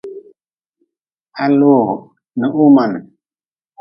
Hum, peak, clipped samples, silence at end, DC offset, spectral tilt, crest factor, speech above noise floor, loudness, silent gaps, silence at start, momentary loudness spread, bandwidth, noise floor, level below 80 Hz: none; 0 dBFS; under 0.1%; 0.75 s; under 0.1%; -10.5 dB/octave; 16 dB; over 78 dB; -13 LUFS; 0.69-0.73 s, 1.12-1.16 s; 0.05 s; 18 LU; 5.8 kHz; under -90 dBFS; -66 dBFS